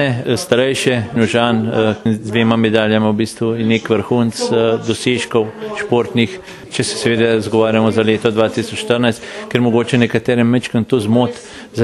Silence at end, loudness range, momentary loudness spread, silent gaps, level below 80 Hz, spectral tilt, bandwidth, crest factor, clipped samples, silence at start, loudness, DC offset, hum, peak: 0 s; 2 LU; 6 LU; none; -52 dBFS; -5.5 dB/octave; 12.5 kHz; 14 dB; under 0.1%; 0 s; -15 LUFS; under 0.1%; none; 0 dBFS